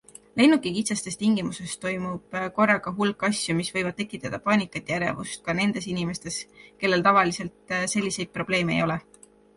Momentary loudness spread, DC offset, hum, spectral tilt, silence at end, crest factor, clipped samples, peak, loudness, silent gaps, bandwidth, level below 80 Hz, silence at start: 12 LU; under 0.1%; none; -4.5 dB/octave; 0.55 s; 20 dB; under 0.1%; -6 dBFS; -25 LUFS; none; 11.5 kHz; -58 dBFS; 0.35 s